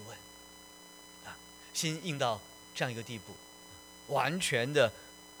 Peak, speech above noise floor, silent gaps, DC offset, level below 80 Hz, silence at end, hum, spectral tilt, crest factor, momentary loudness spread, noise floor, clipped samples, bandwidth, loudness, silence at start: -12 dBFS; 21 dB; none; under 0.1%; -70 dBFS; 0 s; none; -3.5 dB/octave; 24 dB; 22 LU; -54 dBFS; under 0.1%; over 20 kHz; -33 LUFS; 0 s